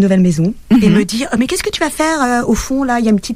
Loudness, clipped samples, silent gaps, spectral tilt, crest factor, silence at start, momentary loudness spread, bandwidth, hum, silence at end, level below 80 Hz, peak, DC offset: -14 LUFS; under 0.1%; none; -5.5 dB/octave; 12 dB; 0 s; 5 LU; 16 kHz; none; 0 s; -34 dBFS; -2 dBFS; under 0.1%